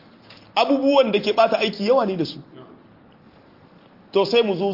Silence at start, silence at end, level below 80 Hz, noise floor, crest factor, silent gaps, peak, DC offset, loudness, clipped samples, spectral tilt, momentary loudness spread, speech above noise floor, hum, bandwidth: 0.3 s; 0 s; -68 dBFS; -50 dBFS; 18 dB; none; -4 dBFS; under 0.1%; -20 LUFS; under 0.1%; -6 dB/octave; 9 LU; 31 dB; none; 5.8 kHz